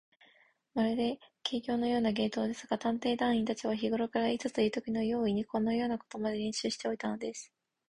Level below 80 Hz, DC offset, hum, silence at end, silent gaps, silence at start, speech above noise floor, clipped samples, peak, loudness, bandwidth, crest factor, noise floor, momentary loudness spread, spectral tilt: -66 dBFS; under 0.1%; none; 0.45 s; none; 0.75 s; 34 dB; under 0.1%; -18 dBFS; -33 LUFS; 11 kHz; 16 dB; -67 dBFS; 6 LU; -5 dB/octave